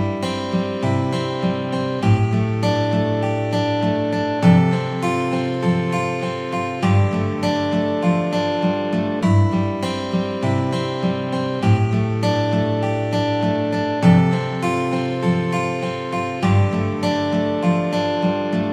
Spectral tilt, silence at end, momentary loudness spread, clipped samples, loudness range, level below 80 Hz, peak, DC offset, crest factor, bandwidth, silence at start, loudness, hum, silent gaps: -7.5 dB/octave; 0 s; 5 LU; under 0.1%; 2 LU; -50 dBFS; -2 dBFS; under 0.1%; 16 dB; 10.5 kHz; 0 s; -20 LUFS; none; none